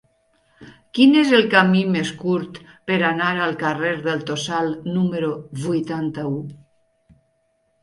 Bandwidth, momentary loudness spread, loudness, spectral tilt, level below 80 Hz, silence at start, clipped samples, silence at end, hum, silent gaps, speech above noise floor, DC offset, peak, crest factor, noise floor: 11.5 kHz; 13 LU; -20 LUFS; -5.5 dB/octave; -62 dBFS; 0.6 s; under 0.1%; 1.3 s; none; none; 47 dB; under 0.1%; 0 dBFS; 20 dB; -67 dBFS